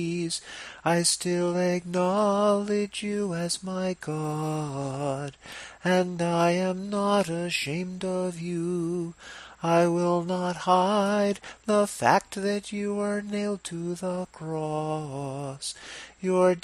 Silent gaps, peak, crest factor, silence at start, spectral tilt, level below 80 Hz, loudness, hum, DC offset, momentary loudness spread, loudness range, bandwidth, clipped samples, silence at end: none; -4 dBFS; 22 dB; 0 s; -5 dB/octave; -62 dBFS; -27 LUFS; none; under 0.1%; 11 LU; 5 LU; 14.5 kHz; under 0.1%; 0.05 s